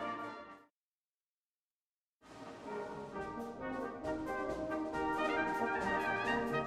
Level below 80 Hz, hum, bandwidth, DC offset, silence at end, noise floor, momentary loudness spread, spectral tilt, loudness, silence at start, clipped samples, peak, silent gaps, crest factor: -62 dBFS; none; 14.5 kHz; under 0.1%; 0 s; under -90 dBFS; 15 LU; -5.5 dB/octave; -38 LUFS; 0 s; under 0.1%; -22 dBFS; 0.70-2.20 s; 16 dB